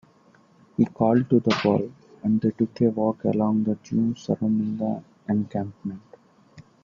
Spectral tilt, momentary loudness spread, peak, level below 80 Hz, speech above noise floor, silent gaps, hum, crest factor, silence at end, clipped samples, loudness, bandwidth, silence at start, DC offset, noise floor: -8 dB/octave; 13 LU; -6 dBFS; -62 dBFS; 34 dB; none; none; 20 dB; 0.2 s; under 0.1%; -24 LUFS; 7.2 kHz; 0.8 s; under 0.1%; -57 dBFS